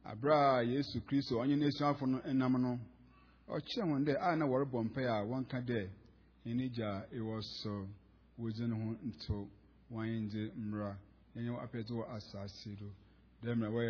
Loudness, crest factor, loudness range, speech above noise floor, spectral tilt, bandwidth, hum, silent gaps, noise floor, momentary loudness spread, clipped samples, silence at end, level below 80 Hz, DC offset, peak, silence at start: -37 LUFS; 20 dB; 7 LU; 27 dB; -6 dB/octave; 5.4 kHz; none; none; -63 dBFS; 15 LU; under 0.1%; 0 s; -64 dBFS; under 0.1%; -18 dBFS; 0.05 s